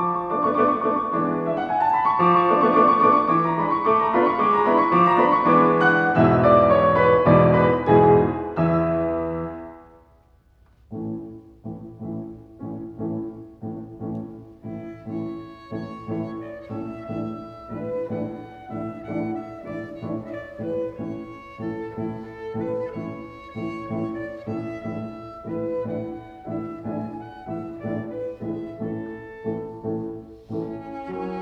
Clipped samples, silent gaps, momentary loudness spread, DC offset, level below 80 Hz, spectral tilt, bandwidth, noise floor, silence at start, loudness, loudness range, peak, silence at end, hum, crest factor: under 0.1%; none; 19 LU; under 0.1%; -50 dBFS; -9 dB/octave; 6.4 kHz; -56 dBFS; 0 s; -22 LUFS; 17 LU; -2 dBFS; 0 s; none; 20 dB